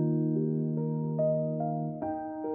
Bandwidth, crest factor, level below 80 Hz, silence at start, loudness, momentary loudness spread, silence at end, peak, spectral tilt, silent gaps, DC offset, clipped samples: 2 kHz; 12 dB; -68 dBFS; 0 s; -31 LUFS; 6 LU; 0 s; -18 dBFS; -15 dB/octave; none; under 0.1%; under 0.1%